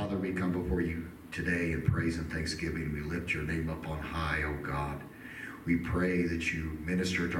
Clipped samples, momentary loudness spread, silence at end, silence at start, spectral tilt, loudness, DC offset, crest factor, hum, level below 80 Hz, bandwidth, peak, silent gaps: under 0.1%; 9 LU; 0 s; 0 s; -6 dB/octave; -33 LUFS; under 0.1%; 18 dB; none; -44 dBFS; 17 kHz; -14 dBFS; none